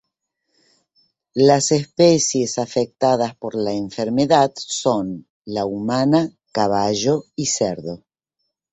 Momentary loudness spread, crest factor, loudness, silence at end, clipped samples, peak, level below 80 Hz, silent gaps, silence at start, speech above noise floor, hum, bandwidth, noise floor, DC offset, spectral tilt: 11 LU; 18 dB; -19 LUFS; 0.75 s; under 0.1%; -2 dBFS; -56 dBFS; 5.30-5.42 s; 1.35 s; 58 dB; none; 8.4 kHz; -76 dBFS; under 0.1%; -4.5 dB/octave